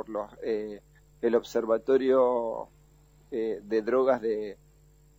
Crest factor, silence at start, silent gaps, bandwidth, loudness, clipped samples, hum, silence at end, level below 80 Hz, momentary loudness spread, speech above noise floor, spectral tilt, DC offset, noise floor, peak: 16 dB; 0 s; none; 17 kHz; -28 LUFS; under 0.1%; none; 0.65 s; -62 dBFS; 16 LU; 31 dB; -6 dB/octave; under 0.1%; -59 dBFS; -12 dBFS